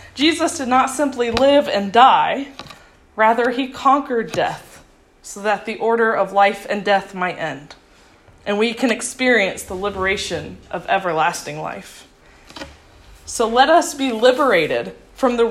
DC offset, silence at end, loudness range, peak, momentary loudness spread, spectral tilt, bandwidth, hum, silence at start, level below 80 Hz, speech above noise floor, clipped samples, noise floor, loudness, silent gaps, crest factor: under 0.1%; 0 s; 6 LU; 0 dBFS; 17 LU; -3.5 dB/octave; 14.5 kHz; none; 0 s; -50 dBFS; 32 dB; under 0.1%; -49 dBFS; -18 LUFS; none; 18 dB